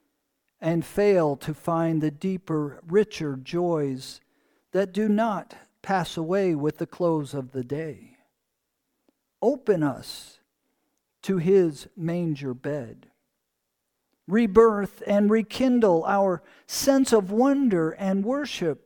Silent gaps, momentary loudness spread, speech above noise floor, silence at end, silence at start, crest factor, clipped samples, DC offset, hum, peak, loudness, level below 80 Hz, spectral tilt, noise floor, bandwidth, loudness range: none; 12 LU; 56 dB; 0.1 s; 0.6 s; 20 dB; under 0.1%; under 0.1%; none; -4 dBFS; -24 LUFS; -58 dBFS; -6 dB/octave; -80 dBFS; 19 kHz; 8 LU